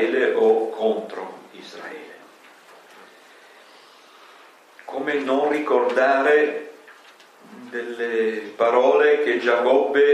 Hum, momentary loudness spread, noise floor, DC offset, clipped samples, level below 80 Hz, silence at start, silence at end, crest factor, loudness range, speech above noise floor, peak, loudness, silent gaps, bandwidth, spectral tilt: none; 20 LU; -49 dBFS; under 0.1%; under 0.1%; -86 dBFS; 0 s; 0 s; 18 dB; 20 LU; 30 dB; -4 dBFS; -20 LUFS; none; 9.2 kHz; -4.5 dB/octave